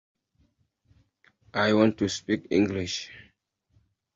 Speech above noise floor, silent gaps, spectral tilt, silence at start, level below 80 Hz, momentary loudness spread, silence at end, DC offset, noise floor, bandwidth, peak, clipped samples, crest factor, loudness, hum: 44 dB; none; -5 dB/octave; 1.55 s; -56 dBFS; 12 LU; 0.95 s; under 0.1%; -69 dBFS; 7.8 kHz; -8 dBFS; under 0.1%; 22 dB; -26 LUFS; none